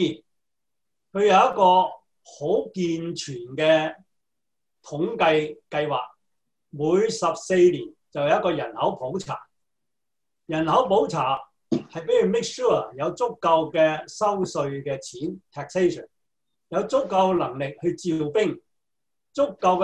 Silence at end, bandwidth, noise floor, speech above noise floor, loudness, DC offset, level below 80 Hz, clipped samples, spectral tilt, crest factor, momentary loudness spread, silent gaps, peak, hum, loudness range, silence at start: 0 s; 10.5 kHz; -87 dBFS; 64 dB; -23 LUFS; under 0.1%; -62 dBFS; under 0.1%; -5.5 dB/octave; 18 dB; 14 LU; none; -6 dBFS; none; 4 LU; 0 s